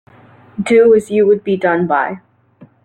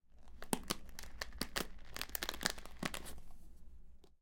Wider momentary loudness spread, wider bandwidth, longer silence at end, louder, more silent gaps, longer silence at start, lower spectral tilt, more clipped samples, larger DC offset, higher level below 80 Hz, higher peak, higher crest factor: second, 15 LU vs 21 LU; second, 9.6 kHz vs 17 kHz; first, 0.65 s vs 0.05 s; first, -13 LUFS vs -43 LUFS; neither; first, 0.6 s vs 0.05 s; first, -6.5 dB/octave vs -2.5 dB/octave; neither; neither; about the same, -56 dBFS vs -54 dBFS; first, -2 dBFS vs -12 dBFS; second, 12 dB vs 32 dB